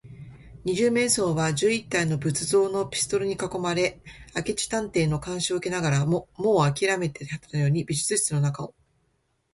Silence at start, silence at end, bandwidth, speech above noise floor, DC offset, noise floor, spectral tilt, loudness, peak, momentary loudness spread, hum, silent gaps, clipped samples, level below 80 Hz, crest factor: 0.05 s; 0.85 s; 12 kHz; 46 dB; under 0.1%; -71 dBFS; -4.5 dB/octave; -25 LUFS; -8 dBFS; 9 LU; none; none; under 0.1%; -54 dBFS; 18 dB